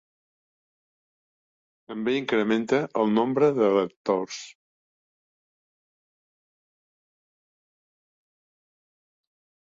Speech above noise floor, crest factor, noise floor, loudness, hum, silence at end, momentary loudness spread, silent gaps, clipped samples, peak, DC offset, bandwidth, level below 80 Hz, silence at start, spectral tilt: over 66 dB; 20 dB; under -90 dBFS; -24 LUFS; none; 5.2 s; 15 LU; 3.96-4.05 s; under 0.1%; -10 dBFS; under 0.1%; 7.8 kHz; -72 dBFS; 1.9 s; -6 dB/octave